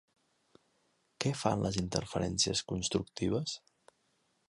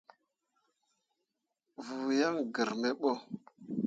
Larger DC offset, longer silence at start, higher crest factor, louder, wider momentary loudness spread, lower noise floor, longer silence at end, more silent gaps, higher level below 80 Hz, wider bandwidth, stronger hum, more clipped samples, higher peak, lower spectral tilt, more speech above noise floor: neither; second, 1.2 s vs 1.8 s; about the same, 24 dB vs 20 dB; about the same, -34 LUFS vs -34 LUFS; second, 6 LU vs 17 LU; second, -76 dBFS vs -86 dBFS; first, 0.9 s vs 0 s; neither; first, -56 dBFS vs -82 dBFS; first, 11.5 kHz vs 7.8 kHz; neither; neither; first, -12 dBFS vs -18 dBFS; about the same, -4 dB/octave vs -5 dB/octave; second, 42 dB vs 52 dB